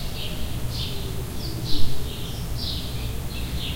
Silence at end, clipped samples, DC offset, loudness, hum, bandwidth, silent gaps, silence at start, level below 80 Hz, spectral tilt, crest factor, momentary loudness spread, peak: 0 s; under 0.1%; 1%; -30 LUFS; none; 16 kHz; none; 0 s; -32 dBFS; -4.5 dB/octave; 18 dB; 3 LU; -4 dBFS